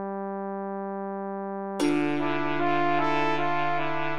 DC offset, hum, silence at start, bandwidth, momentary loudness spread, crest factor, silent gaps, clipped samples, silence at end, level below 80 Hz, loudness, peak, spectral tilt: under 0.1%; none; 0 s; 12 kHz; 8 LU; 16 dB; none; under 0.1%; 0 s; -70 dBFS; -28 LUFS; -12 dBFS; -6 dB/octave